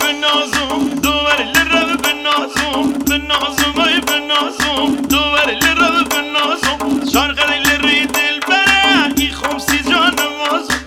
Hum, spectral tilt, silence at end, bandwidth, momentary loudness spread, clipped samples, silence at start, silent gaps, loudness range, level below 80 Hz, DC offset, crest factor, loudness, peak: none; -2 dB/octave; 0 s; 17.5 kHz; 5 LU; under 0.1%; 0 s; none; 2 LU; -36 dBFS; under 0.1%; 14 dB; -13 LUFS; 0 dBFS